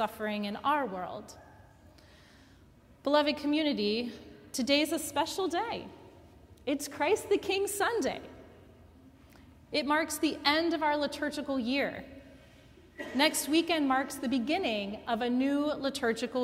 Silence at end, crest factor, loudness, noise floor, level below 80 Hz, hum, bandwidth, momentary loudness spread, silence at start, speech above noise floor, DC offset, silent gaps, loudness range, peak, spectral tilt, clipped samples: 0 s; 22 dB; -31 LUFS; -58 dBFS; -62 dBFS; none; 16 kHz; 13 LU; 0 s; 28 dB; under 0.1%; none; 3 LU; -10 dBFS; -3 dB/octave; under 0.1%